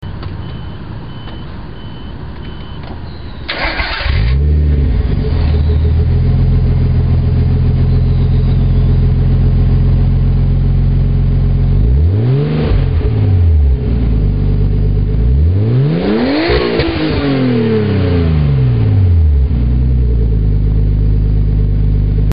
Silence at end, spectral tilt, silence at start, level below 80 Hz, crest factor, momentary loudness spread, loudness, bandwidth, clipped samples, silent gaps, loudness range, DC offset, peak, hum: 0 s; -11.5 dB/octave; 0 s; -14 dBFS; 10 dB; 15 LU; -13 LUFS; 5.2 kHz; under 0.1%; none; 5 LU; 3%; -2 dBFS; none